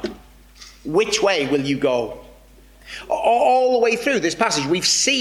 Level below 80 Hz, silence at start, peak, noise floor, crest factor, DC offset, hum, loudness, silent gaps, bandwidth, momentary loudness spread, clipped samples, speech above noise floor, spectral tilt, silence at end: -50 dBFS; 0 s; -4 dBFS; -47 dBFS; 16 dB; under 0.1%; none; -18 LUFS; none; 16 kHz; 16 LU; under 0.1%; 29 dB; -2.5 dB/octave; 0 s